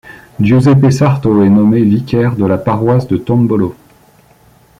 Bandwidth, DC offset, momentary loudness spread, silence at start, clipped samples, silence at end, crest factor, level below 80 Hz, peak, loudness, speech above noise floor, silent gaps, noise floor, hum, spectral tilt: 11.5 kHz; under 0.1%; 6 LU; 0.05 s; under 0.1%; 1.05 s; 10 dB; -42 dBFS; -2 dBFS; -11 LUFS; 36 dB; none; -46 dBFS; none; -8.5 dB/octave